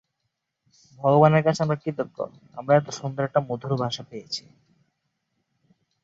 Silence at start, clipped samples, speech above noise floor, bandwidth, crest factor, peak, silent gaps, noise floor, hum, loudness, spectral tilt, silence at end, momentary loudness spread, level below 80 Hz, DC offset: 1 s; under 0.1%; 56 dB; 7.8 kHz; 22 dB; -4 dBFS; none; -79 dBFS; none; -24 LUFS; -6.5 dB/octave; 1.65 s; 16 LU; -66 dBFS; under 0.1%